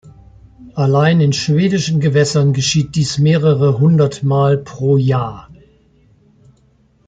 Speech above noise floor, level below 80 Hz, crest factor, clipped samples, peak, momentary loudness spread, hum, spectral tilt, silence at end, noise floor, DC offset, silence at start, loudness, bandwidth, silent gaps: 40 dB; -48 dBFS; 14 dB; under 0.1%; -2 dBFS; 5 LU; none; -6 dB/octave; 1.55 s; -54 dBFS; under 0.1%; 0.05 s; -14 LUFS; 9.2 kHz; none